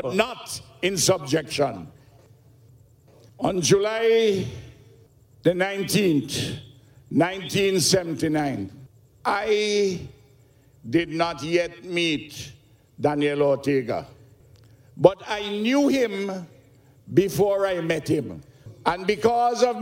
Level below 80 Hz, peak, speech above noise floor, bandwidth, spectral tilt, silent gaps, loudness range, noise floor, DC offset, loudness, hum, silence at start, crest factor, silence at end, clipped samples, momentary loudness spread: -56 dBFS; 0 dBFS; 33 dB; 16.5 kHz; -4.5 dB/octave; none; 3 LU; -55 dBFS; under 0.1%; -23 LUFS; none; 0 s; 24 dB; 0 s; under 0.1%; 14 LU